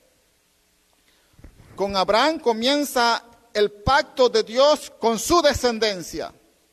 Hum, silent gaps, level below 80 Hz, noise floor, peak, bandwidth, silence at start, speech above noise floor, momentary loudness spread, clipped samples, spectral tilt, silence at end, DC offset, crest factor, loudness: none; none; -46 dBFS; -63 dBFS; -6 dBFS; 13.5 kHz; 1.8 s; 43 dB; 11 LU; under 0.1%; -3.5 dB/octave; 0.4 s; under 0.1%; 16 dB; -20 LUFS